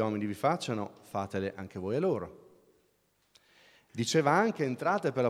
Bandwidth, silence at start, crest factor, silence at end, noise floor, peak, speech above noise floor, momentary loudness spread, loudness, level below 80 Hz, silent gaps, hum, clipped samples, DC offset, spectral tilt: 15.5 kHz; 0 s; 20 dB; 0 s; -72 dBFS; -12 dBFS; 42 dB; 11 LU; -31 LUFS; -72 dBFS; none; none; under 0.1%; under 0.1%; -5.5 dB/octave